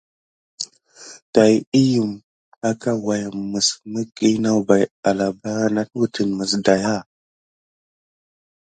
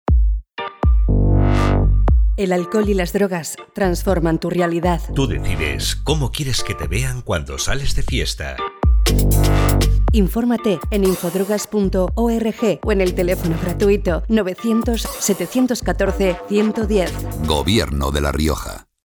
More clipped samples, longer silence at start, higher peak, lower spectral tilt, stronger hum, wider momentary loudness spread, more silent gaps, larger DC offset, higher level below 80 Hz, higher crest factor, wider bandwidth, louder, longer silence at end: neither; first, 0.6 s vs 0.1 s; first, 0 dBFS vs -4 dBFS; about the same, -5 dB/octave vs -5.5 dB/octave; neither; first, 13 LU vs 6 LU; first, 1.22-1.33 s, 1.67-1.72 s, 2.24-2.52 s, 4.91-5.03 s vs none; neither; second, -58 dBFS vs -22 dBFS; first, 20 dB vs 14 dB; second, 9.4 kHz vs over 20 kHz; about the same, -20 LUFS vs -19 LUFS; first, 1.65 s vs 0.3 s